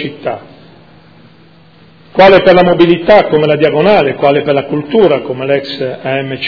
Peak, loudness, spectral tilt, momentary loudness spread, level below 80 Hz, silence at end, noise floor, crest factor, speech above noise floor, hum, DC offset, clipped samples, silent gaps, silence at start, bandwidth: 0 dBFS; -9 LUFS; -8 dB/octave; 13 LU; -42 dBFS; 0 s; -42 dBFS; 10 dB; 33 dB; none; under 0.1%; 2%; none; 0 s; 5.4 kHz